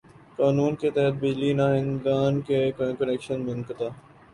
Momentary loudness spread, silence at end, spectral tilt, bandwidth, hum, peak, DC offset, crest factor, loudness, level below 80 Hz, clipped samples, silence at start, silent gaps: 9 LU; 0.35 s; -8 dB/octave; 11 kHz; none; -10 dBFS; under 0.1%; 14 dB; -25 LUFS; -58 dBFS; under 0.1%; 0.4 s; none